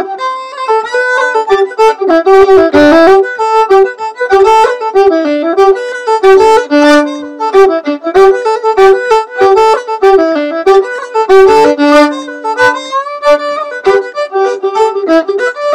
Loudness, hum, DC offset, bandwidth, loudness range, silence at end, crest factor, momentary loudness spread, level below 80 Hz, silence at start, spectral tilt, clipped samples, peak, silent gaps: -8 LUFS; none; under 0.1%; 10.5 kHz; 3 LU; 0 s; 8 dB; 9 LU; -42 dBFS; 0 s; -4 dB/octave; 7%; 0 dBFS; none